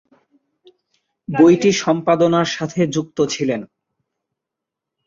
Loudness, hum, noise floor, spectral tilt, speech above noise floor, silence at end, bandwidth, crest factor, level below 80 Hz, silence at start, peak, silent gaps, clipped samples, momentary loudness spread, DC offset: -17 LUFS; none; -83 dBFS; -5.5 dB/octave; 67 dB; 1.4 s; 7.6 kHz; 18 dB; -60 dBFS; 1.3 s; -2 dBFS; none; under 0.1%; 11 LU; under 0.1%